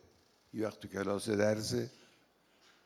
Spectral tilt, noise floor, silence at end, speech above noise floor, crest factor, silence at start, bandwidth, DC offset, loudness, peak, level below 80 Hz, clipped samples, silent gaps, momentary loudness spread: -5 dB/octave; -69 dBFS; 0.95 s; 34 dB; 20 dB; 0.55 s; 15 kHz; under 0.1%; -36 LUFS; -18 dBFS; -74 dBFS; under 0.1%; none; 11 LU